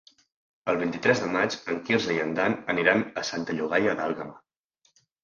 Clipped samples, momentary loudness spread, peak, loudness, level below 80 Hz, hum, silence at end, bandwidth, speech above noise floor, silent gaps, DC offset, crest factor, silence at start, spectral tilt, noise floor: under 0.1%; 8 LU; -4 dBFS; -26 LUFS; -66 dBFS; none; 0.85 s; 7.6 kHz; 44 dB; none; under 0.1%; 22 dB; 0.65 s; -4.5 dB/octave; -70 dBFS